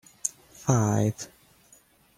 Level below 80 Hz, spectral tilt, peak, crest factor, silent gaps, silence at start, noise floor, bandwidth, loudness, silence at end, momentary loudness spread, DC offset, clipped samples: -60 dBFS; -6 dB/octave; -8 dBFS; 22 dB; none; 0.25 s; -59 dBFS; 16 kHz; -27 LUFS; 0.9 s; 15 LU; under 0.1%; under 0.1%